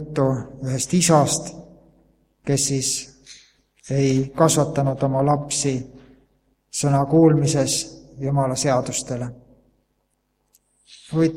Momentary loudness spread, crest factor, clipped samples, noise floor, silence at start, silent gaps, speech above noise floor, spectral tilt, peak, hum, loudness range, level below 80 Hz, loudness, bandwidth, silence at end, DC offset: 14 LU; 20 dB; under 0.1%; -70 dBFS; 0 s; none; 51 dB; -5 dB/octave; -2 dBFS; none; 4 LU; -52 dBFS; -20 LUFS; 16 kHz; 0 s; under 0.1%